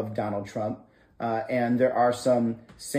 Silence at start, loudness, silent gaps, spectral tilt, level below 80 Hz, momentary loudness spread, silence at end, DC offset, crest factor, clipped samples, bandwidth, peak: 0 s; -26 LUFS; none; -6 dB/octave; -64 dBFS; 11 LU; 0 s; under 0.1%; 16 dB; under 0.1%; 15.5 kHz; -10 dBFS